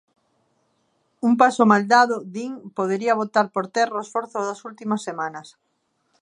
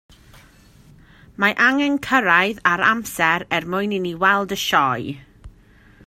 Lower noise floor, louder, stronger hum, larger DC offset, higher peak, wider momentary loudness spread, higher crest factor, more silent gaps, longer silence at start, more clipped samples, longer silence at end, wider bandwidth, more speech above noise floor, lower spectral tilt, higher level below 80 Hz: first, -71 dBFS vs -50 dBFS; second, -21 LUFS vs -18 LUFS; neither; neither; about the same, -2 dBFS vs 0 dBFS; first, 15 LU vs 8 LU; about the same, 20 dB vs 20 dB; neither; second, 1.25 s vs 1.4 s; neither; first, 0.75 s vs 0.55 s; second, 10.5 kHz vs 16 kHz; first, 50 dB vs 31 dB; about the same, -5 dB/octave vs -4 dB/octave; second, -76 dBFS vs -52 dBFS